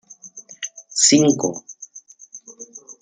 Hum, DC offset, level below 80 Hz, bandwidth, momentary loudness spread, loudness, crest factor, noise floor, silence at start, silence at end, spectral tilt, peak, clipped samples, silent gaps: none; under 0.1%; -70 dBFS; 10 kHz; 26 LU; -16 LUFS; 22 dB; -45 dBFS; 0.25 s; 0.1 s; -3 dB/octave; 0 dBFS; under 0.1%; none